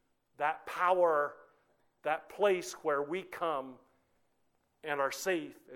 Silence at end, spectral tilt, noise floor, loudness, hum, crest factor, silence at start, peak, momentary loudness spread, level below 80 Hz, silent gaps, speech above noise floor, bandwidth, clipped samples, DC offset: 0 s; -3.5 dB/octave; -75 dBFS; -33 LUFS; none; 20 dB; 0.4 s; -16 dBFS; 10 LU; -80 dBFS; none; 43 dB; 18 kHz; under 0.1%; under 0.1%